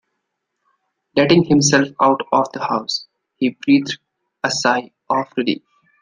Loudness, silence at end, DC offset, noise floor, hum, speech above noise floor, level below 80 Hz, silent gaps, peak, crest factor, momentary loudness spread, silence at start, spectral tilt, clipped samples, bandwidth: -18 LUFS; 0.45 s; under 0.1%; -75 dBFS; none; 59 dB; -60 dBFS; none; -2 dBFS; 18 dB; 11 LU; 1.15 s; -4 dB/octave; under 0.1%; 10 kHz